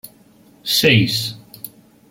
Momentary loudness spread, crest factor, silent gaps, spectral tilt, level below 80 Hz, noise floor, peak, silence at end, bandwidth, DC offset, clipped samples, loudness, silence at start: 22 LU; 20 dB; none; -4 dB/octave; -54 dBFS; -50 dBFS; 0 dBFS; 0.45 s; 16.5 kHz; under 0.1%; under 0.1%; -16 LUFS; 0.05 s